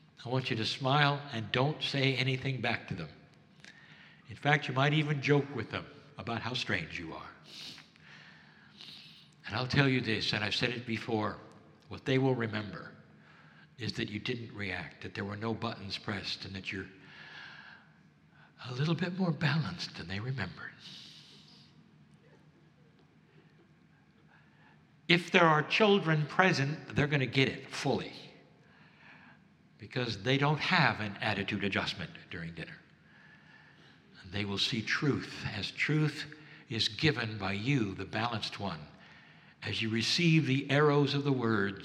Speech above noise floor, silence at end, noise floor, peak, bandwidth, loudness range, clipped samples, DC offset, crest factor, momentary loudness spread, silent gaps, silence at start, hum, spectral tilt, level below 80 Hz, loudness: 31 dB; 0 s; -63 dBFS; -6 dBFS; 10.5 kHz; 10 LU; under 0.1%; under 0.1%; 28 dB; 20 LU; none; 0.2 s; none; -5.5 dB/octave; -68 dBFS; -32 LUFS